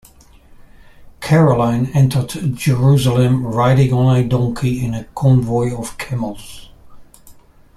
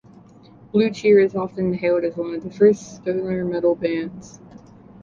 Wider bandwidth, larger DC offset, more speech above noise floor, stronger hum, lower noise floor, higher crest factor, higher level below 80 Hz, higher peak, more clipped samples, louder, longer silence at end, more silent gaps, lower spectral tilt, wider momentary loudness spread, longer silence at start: first, 13 kHz vs 7.4 kHz; neither; about the same, 30 dB vs 27 dB; neither; about the same, -44 dBFS vs -47 dBFS; about the same, 14 dB vs 18 dB; first, -40 dBFS vs -56 dBFS; about the same, -2 dBFS vs -4 dBFS; neither; first, -16 LUFS vs -20 LUFS; second, 0.45 s vs 0.75 s; neither; about the same, -7.5 dB/octave vs -7 dB/octave; about the same, 11 LU vs 12 LU; first, 1 s vs 0.75 s